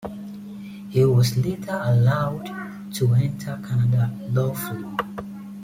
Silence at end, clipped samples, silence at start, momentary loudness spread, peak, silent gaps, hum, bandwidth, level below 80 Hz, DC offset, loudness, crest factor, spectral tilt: 0 s; under 0.1%; 0 s; 17 LU; -8 dBFS; none; none; 16 kHz; -54 dBFS; under 0.1%; -23 LUFS; 14 dB; -7 dB/octave